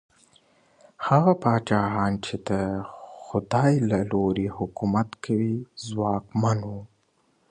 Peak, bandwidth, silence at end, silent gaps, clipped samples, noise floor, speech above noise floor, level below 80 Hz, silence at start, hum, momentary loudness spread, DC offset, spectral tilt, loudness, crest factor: -4 dBFS; 10 kHz; 0.65 s; none; under 0.1%; -67 dBFS; 43 dB; -52 dBFS; 1 s; none; 12 LU; under 0.1%; -7.5 dB/octave; -25 LUFS; 20 dB